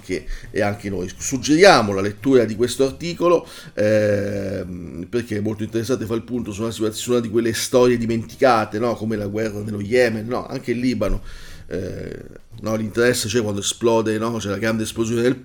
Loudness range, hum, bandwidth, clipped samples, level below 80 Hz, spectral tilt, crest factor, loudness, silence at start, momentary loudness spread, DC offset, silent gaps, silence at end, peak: 6 LU; none; 19 kHz; under 0.1%; -40 dBFS; -5 dB/octave; 20 dB; -20 LUFS; 0 s; 12 LU; under 0.1%; none; 0 s; 0 dBFS